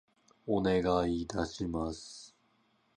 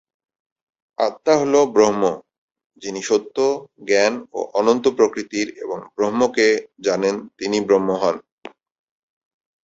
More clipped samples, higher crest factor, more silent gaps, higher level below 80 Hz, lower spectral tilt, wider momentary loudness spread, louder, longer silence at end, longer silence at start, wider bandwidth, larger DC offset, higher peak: neither; about the same, 18 dB vs 18 dB; second, none vs 2.38-2.48 s, 2.66-2.70 s, 8.32-8.42 s; first, -52 dBFS vs -62 dBFS; first, -6 dB/octave vs -4 dB/octave; first, 18 LU vs 12 LU; second, -33 LUFS vs -19 LUFS; second, 0.7 s vs 1.15 s; second, 0.45 s vs 1 s; first, 11 kHz vs 8 kHz; neither; second, -16 dBFS vs -2 dBFS